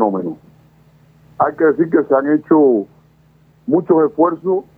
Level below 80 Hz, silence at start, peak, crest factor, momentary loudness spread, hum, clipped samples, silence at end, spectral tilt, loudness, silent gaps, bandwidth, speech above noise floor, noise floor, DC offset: -60 dBFS; 0 s; -2 dBFS; 14 dB; 15 LU; none; under 0.1%; 0.15 s; -11.5 dB/octave; -15 LUFS; none; 2.4 kHz; 37 dB; -51 dBFS; under 0.1%